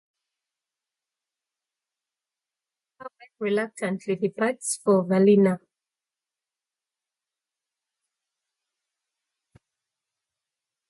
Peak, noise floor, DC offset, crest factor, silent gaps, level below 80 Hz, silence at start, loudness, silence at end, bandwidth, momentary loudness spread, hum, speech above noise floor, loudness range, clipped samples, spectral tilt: -8 dBFS; under -90 dBFS; under 0.1%; 20 dB; none; -76 dBFS; 3 s; -23 LUFS; 5.3 s; 11.5 kHz; 25 LU; none; over 68 dB; 10 LU; under 0.1%; -6 dB/octave